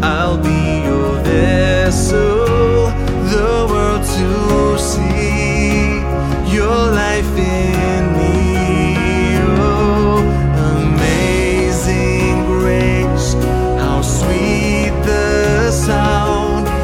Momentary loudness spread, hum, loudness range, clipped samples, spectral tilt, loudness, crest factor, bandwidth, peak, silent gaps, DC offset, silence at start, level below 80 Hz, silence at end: 3 LU; none; 1 LU; under 0.1%; -6 dB/octave; -14 LUFS; 12 dB; 16.5 kHz; 0 dBFS; none; under 0.1%; 0 s; -20 dBFS; 0 s